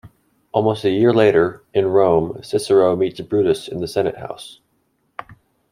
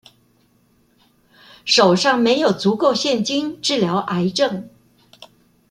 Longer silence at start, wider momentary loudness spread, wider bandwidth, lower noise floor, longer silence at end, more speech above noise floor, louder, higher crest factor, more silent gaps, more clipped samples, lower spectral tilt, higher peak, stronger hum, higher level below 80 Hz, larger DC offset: second, 0.05 s vs 1.65 s; first, 21 LU vs 7 LU; about the same, 12 kHz vs 12.5 kHz; first, -66 dBFS vs -59 dBFS; second, 0.5 s vs 1 s; first, 49 dB vs 42 dB; about the same, -18 LUFS vs -17 LUFS; about the same, 18 dB vs 18 dB; neither; neither; first, -6.5 dB/octave vs -4 dB/octave; about the same, -2 dBFS vs -2 dBFS; neither; first, -54 dBFS vs -62 dBFS; neither